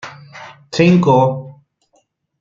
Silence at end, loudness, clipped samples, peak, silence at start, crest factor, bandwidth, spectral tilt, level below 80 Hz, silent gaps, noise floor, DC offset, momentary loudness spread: 0.9 s; -13 LUFS; under 0.1%; -2 dBFS; 0.05 s; 16 dB; 7.4 kHz; -7.5 dB/octave; -54 dBFS; none; -61 dBFS; under 0.1%; 25 LU